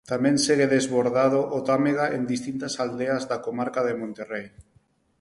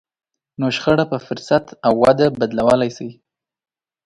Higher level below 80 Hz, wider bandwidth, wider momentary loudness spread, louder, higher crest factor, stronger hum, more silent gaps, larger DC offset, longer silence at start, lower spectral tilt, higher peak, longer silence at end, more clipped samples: second, -62 dBFS vs -50 dBFS; about the same, 11.5 kHz vs 11.5 kHz; about the same, 11 LU vs 10 LU; second, -24 LUFS vs -17 LUFS; about the same, 16 dB vs 18 dB; neither; neither; neither; second, 0.1 s vs 0.6 s; second, -4.5 dB/octave vs -6.5 dB/octave; second, -8 dBFS vs 0 dBFS; second, 0.6 s vs 0.95 s; neither